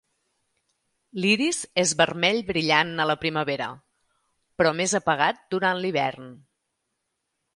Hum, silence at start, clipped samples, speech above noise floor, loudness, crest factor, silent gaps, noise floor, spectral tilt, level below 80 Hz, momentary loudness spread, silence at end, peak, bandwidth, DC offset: none; 1.15 s; under 0.1%; 55 dB; -23 LUFS; 22 dB; none; -79 dBFS; -3 dB/octave; -62 dBFS; 8 LU; 1.2 s; -4 dBFS; 11.5 kHz; under 0.1%